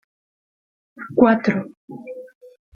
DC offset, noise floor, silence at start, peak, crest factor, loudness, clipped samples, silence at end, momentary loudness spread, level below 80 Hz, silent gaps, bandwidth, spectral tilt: under 0.1%; under -90 dBFS; 1 s; -2 dBFS; 20 dB; -18 LUFS; under 0.1%; 0.5 s; 23 LU; -60 dBFS; 1.77-1.88 s; 6.8 kHz; -8.5 dB/octave